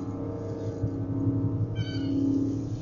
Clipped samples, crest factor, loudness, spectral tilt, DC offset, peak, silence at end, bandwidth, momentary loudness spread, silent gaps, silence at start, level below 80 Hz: under 0.1%; 14 dB; -30 LUFS; -9 dB/octave; under 0.1%; -16 dBFS; 0 s; 7.2 kHz; 7 LU; none; 0 s; -48 dBFS